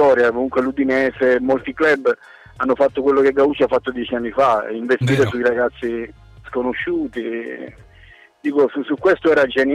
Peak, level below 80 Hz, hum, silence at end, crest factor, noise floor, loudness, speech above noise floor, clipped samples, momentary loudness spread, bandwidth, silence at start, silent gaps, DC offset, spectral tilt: -6 dBFS; -50 dBFS; none; 0 s; 12 dB; -47 dBFS; -18 LUFS; 29 dB; under 0.1%; 11 LU; 11 kHz; 0 s; none; under 0.1%; -7 dB/octave